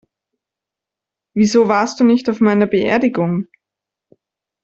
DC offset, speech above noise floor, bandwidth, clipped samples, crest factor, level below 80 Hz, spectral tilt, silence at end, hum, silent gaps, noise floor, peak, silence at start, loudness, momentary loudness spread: under 0.1%; 71 dB; 7.8 kHz; under 0.1%; 16 dB; -58 dBFS; -6 dB/octave; 1.2 s; none; none; -85 dBFS; -2 dBFS; 1.35 s; -15 LUFS; 9 LU